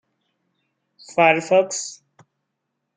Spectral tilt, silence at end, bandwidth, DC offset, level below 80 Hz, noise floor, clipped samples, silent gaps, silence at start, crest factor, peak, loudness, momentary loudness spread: -3.5 dB/octave; 1.05 s; 9.6 kHz; under 0.1%; -72 dBFS; -78 dBFS; under 0.1%; none; 1.1 s; 22 dB; -2 dBFS; -19 LUFS; 13 LU